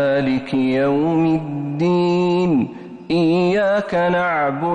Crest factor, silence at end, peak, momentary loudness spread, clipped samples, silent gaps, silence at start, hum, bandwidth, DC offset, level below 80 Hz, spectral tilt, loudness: 8 dB; 0 s; -10 dBFS; 5 LU; under 0.1%; none; 0 s; none; 8.8 kHz; under 0.1%; -54 dBFS; -8 dB/octave; -18 LUFS